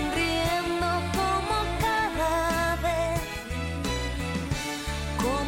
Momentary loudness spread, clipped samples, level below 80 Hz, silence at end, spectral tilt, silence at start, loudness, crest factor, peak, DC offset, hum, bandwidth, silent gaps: 6 LU; under 0.1%; -38 dBFS; 0 s; -4.5 dB/octave; 0 s; -27 LUFS; 12 dB; -16 dBFS; under 0.1%; none; 17 kHz; none